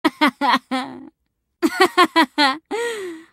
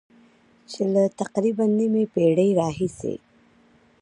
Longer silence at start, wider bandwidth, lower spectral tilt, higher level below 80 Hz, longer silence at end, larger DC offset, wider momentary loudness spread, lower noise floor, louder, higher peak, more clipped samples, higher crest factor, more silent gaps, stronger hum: second, 0.05 s vs 0.7 s; first, 16 kHz vs 11 kHz; second, -2.5 dB/octave vs -7.5 dB/octave; second, -66 dBFS vs -60 dBFS; second, 0.1 s vs 0.85 s; neither; about the same, 11 LU vs 13 LU; first, -73 dBFS vs -58 dBFS; first, -18 LUFS vs -22 LUFS; first, -2 dBFS vs -8 dBFS; neither; about the same, 18 dB vs 16 dB; neither; neither